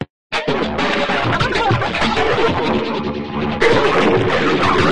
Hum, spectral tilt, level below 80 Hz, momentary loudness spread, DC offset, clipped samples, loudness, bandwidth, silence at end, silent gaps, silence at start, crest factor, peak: none; -5.5 dB/octave; -38 dBFS; 8 LU; 2%; under 0.1%; -16 LUFS; 11 kHz; 0 s; 0.10-0.30 s; 0 s; 16 dB; 0 dBFS